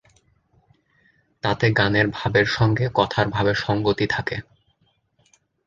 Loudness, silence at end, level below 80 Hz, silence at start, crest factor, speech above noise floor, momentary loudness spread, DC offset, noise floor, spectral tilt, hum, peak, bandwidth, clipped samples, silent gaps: -21 LUFS; 1.25 s; -48 dBFS; 1.45 s; 20 dB; 45 dB; 7 LU; under 0.1%; -66 dBFS; -6.5 dB/octave; none; -2 dBFS; 7.4 kHz; under 0.1%; none